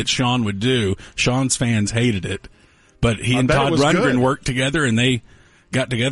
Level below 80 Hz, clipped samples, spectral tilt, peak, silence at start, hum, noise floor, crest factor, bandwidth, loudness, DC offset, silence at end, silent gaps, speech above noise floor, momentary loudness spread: -40 dBFS; under 0.1%; -4.5 dB/octave; -6 dBFS; 0 s; none; -42 dBFS; 14 dB; 11.5 kHz; -19 LUFS; under 0.1%; 0 s; none; 24 dB; 8 LU